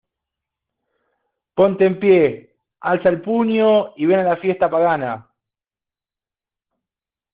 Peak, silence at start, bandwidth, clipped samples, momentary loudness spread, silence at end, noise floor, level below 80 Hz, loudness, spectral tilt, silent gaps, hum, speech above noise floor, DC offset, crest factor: -2 dBFS; 1.55 s; 4.8 kHz; under 0.1%; 13 LU; 2.15 s; -90 dBFS; -62 dBFS; -17 LUFS; -5.5 dB/octave; none; none; 74 dB; under 0.1%; 16 dB